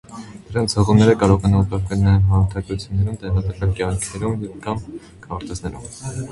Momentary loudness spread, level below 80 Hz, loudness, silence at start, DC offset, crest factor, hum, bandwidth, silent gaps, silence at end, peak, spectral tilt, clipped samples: 17 LU; -32 dBFS; -19 LUFS; 0.1 s; under 0.1%; 18 dB; none; 11.5 kHz; none; 0 s; 0 dBFS; -6.5 dB/octave; under 0.1%